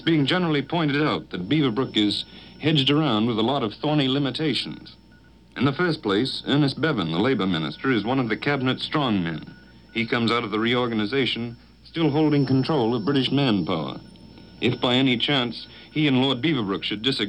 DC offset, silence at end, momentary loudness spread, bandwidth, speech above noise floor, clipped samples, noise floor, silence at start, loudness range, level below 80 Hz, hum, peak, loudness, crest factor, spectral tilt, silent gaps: under 0.1%; 0 s; 8 LU; 9.6 kHz; 29 dB; under 0.1%; -52 dBFS; 0 s; 2 LU; -56 dBFS; none; -8 dBFS; -23 LUFS; 16 dB; -6.5 dB/octave; none